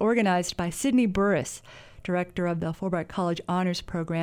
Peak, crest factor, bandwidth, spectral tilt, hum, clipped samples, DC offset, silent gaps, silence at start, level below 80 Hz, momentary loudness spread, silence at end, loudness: -10 dBFS; 16 dB; 19.5 kHz; -5.5 dB/octave; none; under 0.1%; under 0.1%; none; 0 s; -50 dBFS; 7 LU; 0 s; -27 LUFS